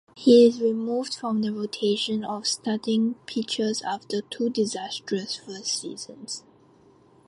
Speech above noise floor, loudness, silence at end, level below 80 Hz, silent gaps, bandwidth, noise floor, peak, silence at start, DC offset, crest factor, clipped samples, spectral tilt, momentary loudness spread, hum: 32 dB; -25 LUFS; 0.9 s; -72 dBFS; none; 11.5 kHz; -56 dBFS; -6 dBFS; 0.15 s; under 0.1%; 20 dB; under 0.1%; -4 dB/octave; 14 LU; none